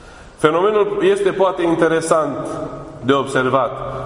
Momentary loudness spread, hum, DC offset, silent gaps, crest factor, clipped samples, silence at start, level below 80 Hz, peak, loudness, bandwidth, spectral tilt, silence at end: 10 LU; none; under 0.1%; none; 18 dB; under 0.1%; 0.05 s; -46 dBFS; 0 dBFS; -17 LUFS; 11 kHz; -5.5 dB/octave; 0 s